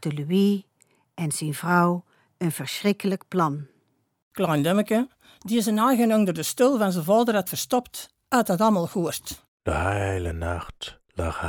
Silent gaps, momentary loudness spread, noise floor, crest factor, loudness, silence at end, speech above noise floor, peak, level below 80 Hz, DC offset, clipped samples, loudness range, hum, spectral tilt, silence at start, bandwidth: 4.22-4.31 s, 9.48-9.58 s; 13 LU; -68 dBFS; 18 dB; -24 LUFS; 0 s; 45 dB; -8 dBFS; -46 dBFS; under 0.1%; under 0.1%; 4 LU; none; -5.5 dB/octave; 0 s; over 20 kHz